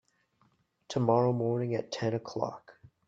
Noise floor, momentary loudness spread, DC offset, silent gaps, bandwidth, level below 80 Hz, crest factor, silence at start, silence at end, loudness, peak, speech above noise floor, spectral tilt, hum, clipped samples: -71 dBFS; 11 LU; under 0.1%; none; 7.6 kHz; -70 dBFS; 20 dB; 0.9 s; 0.35 s; -31 LUFS; -12 dBFS; 41 dB; -7 dB/octave; none; under 0.1%